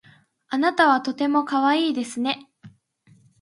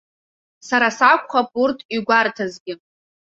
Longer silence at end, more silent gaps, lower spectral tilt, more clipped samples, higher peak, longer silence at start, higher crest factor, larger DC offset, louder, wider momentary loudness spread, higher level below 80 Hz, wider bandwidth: first, 0.7 s vs 0.5 s; second, none vs 1.85-1.89 s, 2.60-2.66 s; about the same, -3.5 dB/octave vs -3.5 dB/octave; neither; about the same, -4 dBFS vs -2 dBFS; second, 0.5 s vs 0.65 s; about the same, 18 dB vs 18 dB; neither; second, -22 LUFS vs -18 LUFS; second, 8 LU vs 17 LU; second, -76 dBFS vs -66 dBFS; first, 11.5 kHz vs 8 kHz